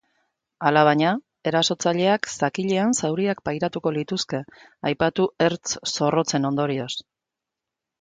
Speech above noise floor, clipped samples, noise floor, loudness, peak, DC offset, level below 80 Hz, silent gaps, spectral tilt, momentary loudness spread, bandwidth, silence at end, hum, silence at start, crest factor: 64 dB; under 0.1%; -86 dBFS; -23 LUFS; -4 dBFS; under 0.1%; -60 dBFS; none; -4.5 dB/octave; 9 LU; 9.6 kHz; 1 s; none; 0.6 s; 20 dB